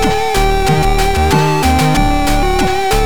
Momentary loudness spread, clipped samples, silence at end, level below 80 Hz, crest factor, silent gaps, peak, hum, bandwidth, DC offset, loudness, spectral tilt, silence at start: 2 LU; under 0.1%; 0 s; -18 dBFS; 10 dB; none; -2 dBFS; none; 19 kHz; 8%; -13 LUFS; -5 dB/octave; 0 s